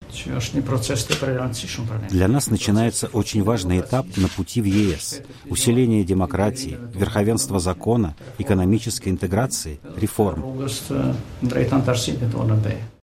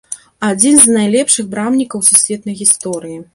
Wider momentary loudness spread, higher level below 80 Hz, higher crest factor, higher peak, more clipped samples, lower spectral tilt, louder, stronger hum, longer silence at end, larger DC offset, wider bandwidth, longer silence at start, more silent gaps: second, 8 LU vs 13 LU; first, -40 dBFS vs -56 dBFS; first, 20 dB vs 14 dB; about the same, 0 dBFS vs 0 dBFS; second, under 0.1% vs 0.5%; first, -5.5 dB/octave vs -2.5 dB/octave; second, -22 LUFS vs -10 LUFS; neither; about the same, 0.1 s vs 0.1 s; neither; about the same, 16 kHz vs 16 kHz; about the same, 0 s vs 0.1 s; neither